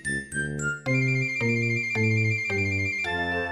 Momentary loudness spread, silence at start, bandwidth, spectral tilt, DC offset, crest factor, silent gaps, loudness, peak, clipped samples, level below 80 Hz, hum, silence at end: 6 LU; 0 s; 12 kHz; -5.5 dB/octave; under 0.1%; 14 dB; none; -25 LUFS; -12 dBFS; under 0.1%; -52 dBFS; none; 0 s